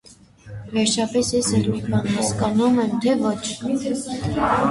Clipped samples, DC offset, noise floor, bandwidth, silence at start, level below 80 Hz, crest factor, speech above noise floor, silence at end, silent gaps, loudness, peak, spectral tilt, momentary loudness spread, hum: under 0.1%; under 0.1%; -45 dBFS; 11.5 kHz; 0.1 s; -46 dBFS; 14 dB; 24 dB; 0 s; none; -21 LUFS; -6 dBFS; -5 dB/octave; 7 LU; none